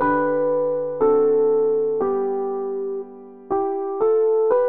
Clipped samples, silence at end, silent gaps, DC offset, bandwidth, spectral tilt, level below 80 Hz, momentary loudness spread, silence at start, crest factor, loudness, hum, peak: under 0.1%; 0 s; none; 0.5%; 2.6 kHz; -7 dB/octave; -60 dBFS; 9 LU; 0 s; 12 dB; -21 LUFS; none; -8 dBFS